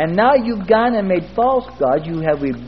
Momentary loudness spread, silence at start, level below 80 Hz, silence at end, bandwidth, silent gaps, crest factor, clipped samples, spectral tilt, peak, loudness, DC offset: 5 LU; 0 s; -44 dBFS; 0 s; 6 kHz; none; 16 dB; under 0.1%; -9 dB/octave; -2 dBFS; -17 LUFS; 0.6%